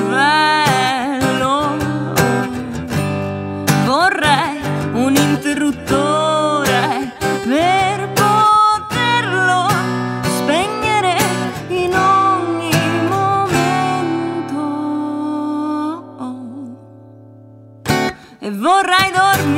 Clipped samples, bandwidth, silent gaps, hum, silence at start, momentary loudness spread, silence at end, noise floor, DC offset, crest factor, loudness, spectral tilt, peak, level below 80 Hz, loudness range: under 0.1%; 16 kHz; none; none; 0 s; 9 LU; 0 s; -40 dBFS; under 0.1%; 16 dB; -15 LUFS; -4.5 dB/octave; 0 dBFS; -46 dBFS; 8 LU